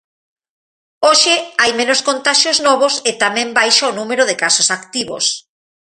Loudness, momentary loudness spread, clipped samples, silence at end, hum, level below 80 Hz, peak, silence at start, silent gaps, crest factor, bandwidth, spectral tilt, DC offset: -13 LUFS; 7 LU; under 0.1%; 0.45 s; none; -64 dBFS; 0 dBFS; 1 s; none; 16 dB; 11.5 kHz; 0 dB/octave; under 0.1%